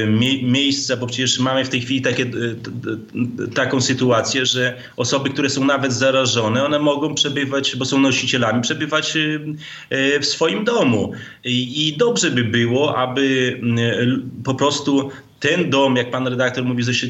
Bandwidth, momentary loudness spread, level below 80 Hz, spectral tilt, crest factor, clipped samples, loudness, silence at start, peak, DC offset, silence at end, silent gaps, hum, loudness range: 8.4 kHz; 8 LU; -62 dBFS; -4 dB/octave; 14 dB; under 0.1%; -18 LUFS; 0 s; -4 dBFS; under 0.1%; 0 s; none; none; 2 LU